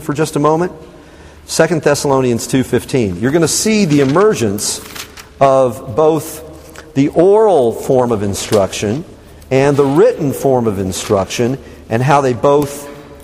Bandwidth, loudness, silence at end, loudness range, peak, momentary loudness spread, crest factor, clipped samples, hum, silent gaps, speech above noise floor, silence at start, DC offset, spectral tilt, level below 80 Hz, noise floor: 15.5 kHz; -13 LUFS; 0 s; 2 LU; 0 dBFS; 11 LU; 14 dB; under 0.1%; none; none; 25 dB; 0 s; under 0.1%; -5 dB/octave; -42 dBFS; -38 dBFS